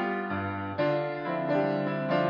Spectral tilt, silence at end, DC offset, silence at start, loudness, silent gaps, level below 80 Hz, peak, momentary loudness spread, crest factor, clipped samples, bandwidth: -5.5 dB/octave; 0 s; under 0.1%; 0 s; -29 LUFS; none; -74 dBFS; -16 dBFS; 5 LU; 14 dB; under 0.1%; 7 kHz